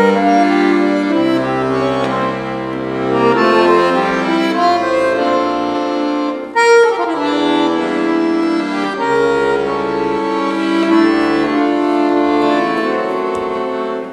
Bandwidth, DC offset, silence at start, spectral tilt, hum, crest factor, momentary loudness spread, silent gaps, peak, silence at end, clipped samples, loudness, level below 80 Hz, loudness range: 11.5 kHz; under 0.1%; 0 s; -5.5 dB/octave; none; 14 dB; 7 LU; none; 0 dBFS; 0 s; under 0.1%; -14 LUFS; -50 dBFS; 2 LU